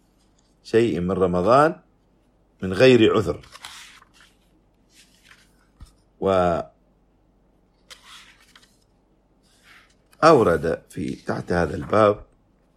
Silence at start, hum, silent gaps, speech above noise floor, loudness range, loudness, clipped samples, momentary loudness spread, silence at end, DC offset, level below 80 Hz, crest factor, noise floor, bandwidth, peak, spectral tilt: 0.65 s; none; none; 42 dB; 9 LU; -20 LUFS; under 0.1%; 24 LU; 0.55 s; under 0.1%; -50 dBFS; 22 dB; -61 dBFS; 13.5 kHz; -2 dBFS; -6.5 dB/octave